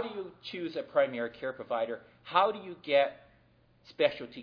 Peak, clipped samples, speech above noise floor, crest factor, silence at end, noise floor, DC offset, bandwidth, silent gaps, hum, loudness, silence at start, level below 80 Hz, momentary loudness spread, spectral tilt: -10 dBFS; under 0.1%; 33 dB; 22 dB; 0 s; -65 dBFS; under 0.1%; 5.4 kHz; none; none; -32 LUFS; 0 s; -74 dBFS; 12 LU; -6 dB/octave